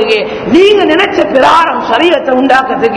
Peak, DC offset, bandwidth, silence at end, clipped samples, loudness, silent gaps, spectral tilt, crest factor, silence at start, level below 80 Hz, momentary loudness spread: 0 dBFS; under 0.1%; 11 kHz; 0 s; 4%; -8 LUFS; none; -4.5 dB/octave; 8 dB; 0 s; -42 dBFS; 4 LU